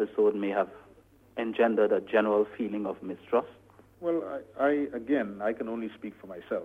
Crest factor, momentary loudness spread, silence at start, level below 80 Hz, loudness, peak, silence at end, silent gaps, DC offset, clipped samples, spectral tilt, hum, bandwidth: 18 dB; 14 LU; 0 s; -68 dBFS; -29 LUFS; -10 dBFS; 0 s; none; under 0.1%; under 0.1%; -7.5 dB/octave; none; 4 kHz